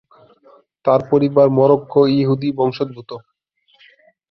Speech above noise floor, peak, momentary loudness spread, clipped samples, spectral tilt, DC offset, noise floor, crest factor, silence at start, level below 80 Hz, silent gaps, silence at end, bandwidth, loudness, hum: 45 dB; -2 dBFS; 16 LU; under 0.1%; -10 dB/octave; under 0.1%; -60 dBFS; 16 dB; 0.85 s; -58 dBFS; none; 1.1 s; 6 kHz; -16 LUFS; none